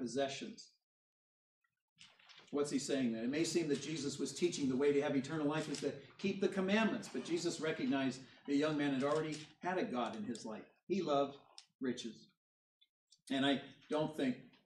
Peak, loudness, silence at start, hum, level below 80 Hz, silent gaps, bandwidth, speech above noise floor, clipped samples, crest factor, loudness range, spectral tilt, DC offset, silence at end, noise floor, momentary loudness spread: -22 dBFS; -38 LUFS; 0 s; none; -82 dBFS; 0.83-1.61 s, 1.82-1.96 s, 10.83-10.87 s, 11.75-11.79 s, 12.37-12.81 s, 12.89-13.07 s; 12.5 kHz; 25 dB; under 0.1%; 18 dB; 5 LU; -4.5 dB/octave; under 0.1%; 0.2 s; -62 dBFS; 10 LU